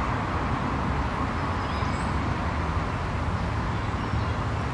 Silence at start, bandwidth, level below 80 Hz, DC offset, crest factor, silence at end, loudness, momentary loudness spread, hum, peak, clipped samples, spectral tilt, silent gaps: 0 s; 11 kHz; -34 dBFS; under 0.1%; 12 dB; 0 s; -28 LUFS; 1 LU; none; -14 dBFS; under 0.1%; -6.5 dB/octave; none